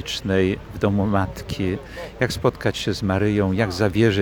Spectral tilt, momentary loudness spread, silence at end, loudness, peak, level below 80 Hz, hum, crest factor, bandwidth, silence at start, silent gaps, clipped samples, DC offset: -6 dB/octave; 6 LU; 0 s; -22 LUFS; -4 dBFS; -42 dBFS; none; 18 dB; 19 kHz; 0 s; none; under 0.1%; under 0.1%